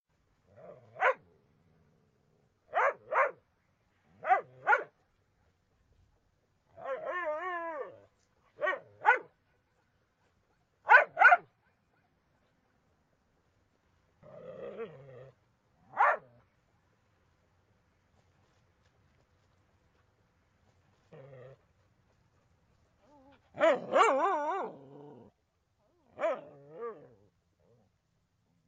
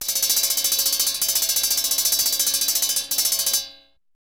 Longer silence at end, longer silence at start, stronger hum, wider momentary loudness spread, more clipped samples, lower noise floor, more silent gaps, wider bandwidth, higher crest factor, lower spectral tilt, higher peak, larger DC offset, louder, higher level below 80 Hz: first, 1.75 s vs 0.5 s; first, 0.65 s vs 0 s; neither; first, 23 LU vs 2 LU; neither; first, -76 dBFS vs -47 dBFS; neither; second, 9.4 kHz vs 19.5 kHz; first, 28 dB vs 16 dB; first, -3.5 dB/octave vs 2.5 dB/octave; about the same, -8 dBFS vs -6 dBFS; second, under 0.1% vs 0.1%; second, -29 LUFS vs -18 LUFS; second, -80 dBFS vs -56 dBFS